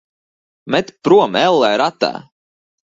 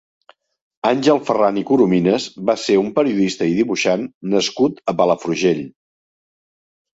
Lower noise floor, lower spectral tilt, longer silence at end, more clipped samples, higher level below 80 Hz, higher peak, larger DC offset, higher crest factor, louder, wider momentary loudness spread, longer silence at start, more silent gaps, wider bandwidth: about the same, under -90 dBFS vs under -90 dBFS; about the same, -5 dB/octave vs -5.5 dB/octave; second, 0.7 s vs 1.25 s; neither; about the same, -60 dBFS vs -60 dBFS; about the same, 0 dBFS vs -2 dBFS; neither; about the same, 16 dB vs 16 dB; first, -15 LUFS vs -18 LUFS; first, 9 LU vs 5 LU; second, 0.65 s vs 0.85 s; second, none vs 4.14-4.21 s; about the same, 7.8 kHz vs 8 kHz